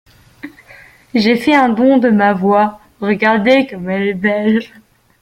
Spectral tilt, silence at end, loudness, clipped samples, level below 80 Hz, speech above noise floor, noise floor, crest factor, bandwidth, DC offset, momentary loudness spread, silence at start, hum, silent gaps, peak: -7 dB/octave; 0.55 s; -13 LUFS; under 0.1%; -54 dBFS; 29 dB; -42 dBFS; 14 dB; 13.5 kHz; under 0.1%; 9 LU; 0.45 s; none; none; 0 dBFS